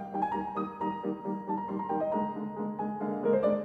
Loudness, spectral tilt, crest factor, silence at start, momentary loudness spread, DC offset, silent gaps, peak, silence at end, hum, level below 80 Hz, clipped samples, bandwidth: -33 LUFS; -9.5 dB/octave; 16 dB; 0 s; 7 LU; under 0.1%; none; -16 dBFS; 0 s; none; -66 dBFS; under 0.1%; 4.8 kHz